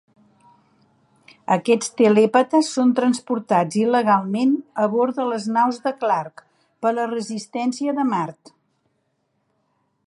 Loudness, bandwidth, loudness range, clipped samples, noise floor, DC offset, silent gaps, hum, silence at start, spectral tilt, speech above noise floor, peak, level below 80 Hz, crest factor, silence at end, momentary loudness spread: -20 LUFS; 11.5 kHz; 8 LU; under 0.1%; -70 dBFS; under 0.1%; none; none; 1.5 s; -5.5 dB/octave; 51 dB; -4 dBFS; -76 dBFS; 18 dB; 1.75 s; 9 LU